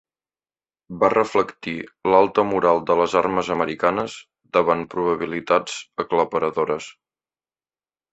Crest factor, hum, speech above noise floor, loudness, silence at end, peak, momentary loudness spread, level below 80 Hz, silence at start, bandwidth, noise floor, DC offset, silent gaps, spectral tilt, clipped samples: 20 dB; none; over 69 dB; -21 LUFS; 1.2 s; -2 dBFS; 12 LU; -58 dBFS; 0.9 s; 8.2 kHz; under -90 dBFS; under 0.1%; none; -5.5 dB/octave; under 0.1%